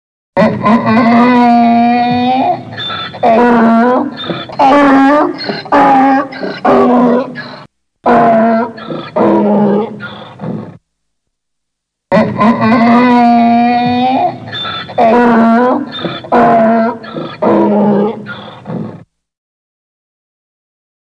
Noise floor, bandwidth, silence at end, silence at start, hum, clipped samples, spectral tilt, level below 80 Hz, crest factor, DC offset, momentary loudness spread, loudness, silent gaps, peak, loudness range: -74 dBFS; 7 kHz; 2.1 s; 0.35 s; none; under 0.1%; -7.5 dB/octave; -50 dBFS; 10 dB; under 0.1%; 15 LU; -10 LUFS; none; 0 dBFS; 6 LU